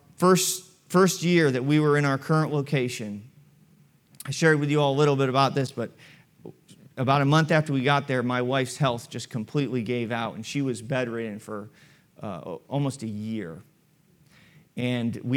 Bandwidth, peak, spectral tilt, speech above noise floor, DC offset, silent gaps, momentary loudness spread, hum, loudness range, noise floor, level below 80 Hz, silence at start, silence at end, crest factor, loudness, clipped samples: 17 kHz; -6 dBFS; -5.5 dB/octave; 38 dB; under 0.1%; none; 16 LU; none; 9 LU; -62 dBFS; -72 dBFS; 0.2 s; 0 s; 20 dB; -25 LUFS; under 0.1%